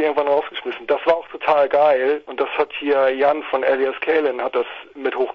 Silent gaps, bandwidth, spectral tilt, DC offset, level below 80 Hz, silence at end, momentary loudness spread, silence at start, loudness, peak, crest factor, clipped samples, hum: none; 6 kHz; -5.5 dB/octave; under 0.1%; -62 dBFS; 0 s; 9 LU; 0 s; -19 LUFS; -2 dBFS; 18 dB; under 0.1%; none